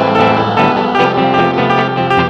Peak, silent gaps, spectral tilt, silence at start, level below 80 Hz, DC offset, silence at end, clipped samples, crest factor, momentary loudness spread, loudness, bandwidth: 0 dBFS; none; -7 dB/octave; 0 s; -44 dBFS; under 0.1%; 0 s; under 0.1%; 12 dB; 2 LU; -12 LUFS; 8.6 kHz